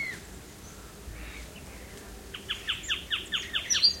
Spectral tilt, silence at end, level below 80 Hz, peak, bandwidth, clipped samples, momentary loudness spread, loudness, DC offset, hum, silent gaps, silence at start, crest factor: -0.5 dB/octave; 0 s; -50 dBFS; -8 dBFS; 16.5 kHz; under 0.1%; 20 LU; -28 LUFS; under 0.1%; none; none; 0 s; 24 dB